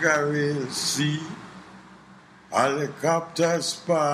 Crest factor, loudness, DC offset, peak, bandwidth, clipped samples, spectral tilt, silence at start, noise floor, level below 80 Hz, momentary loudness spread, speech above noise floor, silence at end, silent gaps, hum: 18 dB; -25 LUFS; under 0.1%; -6 dBFS; 15.5 kHz; under 0.1%; -4 dB/octave; 0 s; -50 dBFS; -68 dBFS; 14 LU; 26 dB; 0 s; none; none